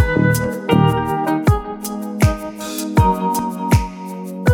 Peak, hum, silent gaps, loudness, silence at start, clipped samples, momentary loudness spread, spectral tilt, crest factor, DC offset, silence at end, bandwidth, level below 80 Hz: 0 dBFS; none; none; -18 LUFS; 0 s; under 0.1%; 11 LU; -6.5 dB/octave; 16 dB; under 0.1%; 0 s; over 20 kHz; -28 dBFS